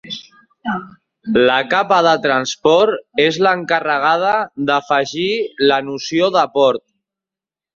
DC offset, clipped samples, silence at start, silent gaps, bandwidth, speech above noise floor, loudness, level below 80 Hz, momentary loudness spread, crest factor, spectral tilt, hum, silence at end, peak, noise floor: under 0.1%; under 0.1%; 0.05 s; none; 7.6 kHz; 73 dB; -16 LUFS; -60 dBFS; 11 LU; 16 dB; -4 dB/octave; none; 0.95 s; -2 dBFS; -89 dBFS